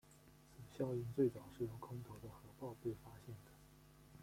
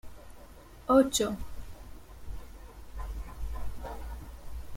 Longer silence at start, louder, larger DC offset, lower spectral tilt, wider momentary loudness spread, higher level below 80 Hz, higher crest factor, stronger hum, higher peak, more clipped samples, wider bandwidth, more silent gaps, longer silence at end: about the same, 0.05 s vs 0.05 s; second, -46 LUFS vs -31 LUFS; neither; first, -8 dB/octave vs -4.5 dB/octave; second, 25 LU vs 28 LU; second, -70 dBFS vs -42 dBFS; about the same, 22 dB vs 22 dB; neither; second, -26 dBFS vs -10 dBFS; neither; about the same, 16.5 kHz vs 16.5 kHz; neither; about the same, 0 s vs 0 s